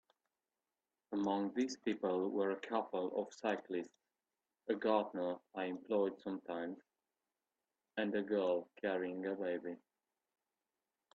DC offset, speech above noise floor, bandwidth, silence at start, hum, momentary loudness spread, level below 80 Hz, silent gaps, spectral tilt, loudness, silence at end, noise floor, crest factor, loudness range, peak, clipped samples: under 0.1%; over 51 dB; 8 kHz; 1.1 s; none; 9 LU; -86 dBFS; none; -5.5 dB/octave; -40 LUFS; 1.4 s; under -90 dBFS; 22 dB; 2 LU; -18 dBFS; under 0.1%